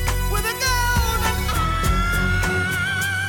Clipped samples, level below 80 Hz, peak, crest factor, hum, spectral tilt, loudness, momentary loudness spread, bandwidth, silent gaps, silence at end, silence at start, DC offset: under 0.1%; -26 dBFS; -10 dBFS; 12 dB; none; -3.5 dB/octave; -21 LUFS; 2 LU; 19 kHz; none; 0 s; 0 s; under 0.1%